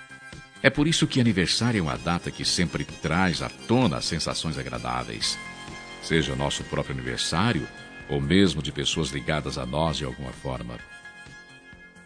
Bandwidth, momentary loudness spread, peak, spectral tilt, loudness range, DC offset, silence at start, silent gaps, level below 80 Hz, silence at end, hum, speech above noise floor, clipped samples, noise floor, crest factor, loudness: 10.5 kHz; 17 LU; 0 dBFS; -4.5 dB/octave; 4 LU; under 0.1%; 0 s; none; -44 dBFS; 0 s; none; 23 dB; under 0.1%; -48 dBFS; 26 dB; -25 LUFS